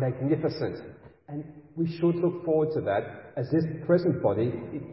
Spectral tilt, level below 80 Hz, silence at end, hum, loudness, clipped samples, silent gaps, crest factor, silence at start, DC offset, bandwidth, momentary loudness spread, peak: -12 dB/octave; -60 dBFS; 0 s; none; -28 LUFS; under 0.1%; none; 16 dB; 0 s; under 0.1%; 5.8 kHz; 15 LU; -10 dBFS